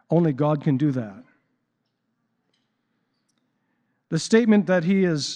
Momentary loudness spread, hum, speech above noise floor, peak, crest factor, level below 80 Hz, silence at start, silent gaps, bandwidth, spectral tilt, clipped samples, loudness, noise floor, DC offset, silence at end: 12 LU; none; 55 dB; -4 dBFS; 20 dB; -74 dBFS; 0.1 s; none; 9.8 kHz; -6.5 dB/octave; under 0.1%; -21 LUFS; -75 dBFS; under 0.1%; 0 s